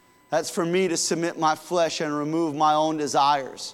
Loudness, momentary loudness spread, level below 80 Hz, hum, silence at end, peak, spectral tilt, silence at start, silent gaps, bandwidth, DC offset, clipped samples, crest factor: -24 LUFS; 5 LU; -72 dBFS; none; 0 s; -8 dBFS; -3.5 dB/octave; 0.3 s; none; 16.5 kHz; under 0.1%; under 0.1%; 16 dB